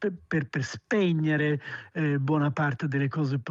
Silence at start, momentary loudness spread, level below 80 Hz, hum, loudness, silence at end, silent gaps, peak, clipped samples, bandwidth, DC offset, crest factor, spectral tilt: 0 s; 7 LU; -68 dBFS; none; -28 LUFS; 0 s; none; -14 dBFS; under 0.1%; 7.6 kHz; under 0.1%; 14 dB; -7.5 dB/octave